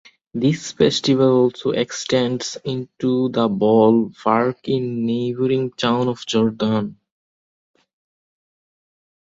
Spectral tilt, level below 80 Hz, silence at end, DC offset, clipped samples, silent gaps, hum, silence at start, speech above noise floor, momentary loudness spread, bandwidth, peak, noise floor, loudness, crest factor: -5.5 dB/octave; -58 dBFS; 2.45 s; under 0.1%; under 0.1%; none; none; 0.35 s; over 71 dB; 9 LU; 8 kHz; -2 dBFS; under -90 dBFS; -19 LUFS; 18 dB